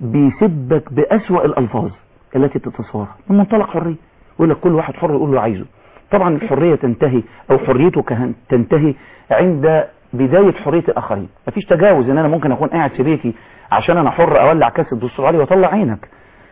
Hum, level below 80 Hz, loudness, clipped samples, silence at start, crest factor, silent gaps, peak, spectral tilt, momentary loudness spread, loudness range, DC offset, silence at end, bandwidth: none; -46 dBFS; -15 LUFS; under 0.1%; 0 s; 12 dB; none; -2 dBFS; -12 dB/octave; 12 LU; 3 LU; 0.3%; 0.55 s; 3.9 kHz